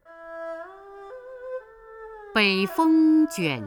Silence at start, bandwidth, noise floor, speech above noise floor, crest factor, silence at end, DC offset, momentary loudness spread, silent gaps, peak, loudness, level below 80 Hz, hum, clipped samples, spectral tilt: 0.1 s; 19.5 kHz; -44 dBFS; 24 dB; 16 dB; 0 s; under 0.1%; 24 LU; none; -8 dBFS; -21 LUFS; -62 dBFS; none; under 0.1%; -5 dB/octave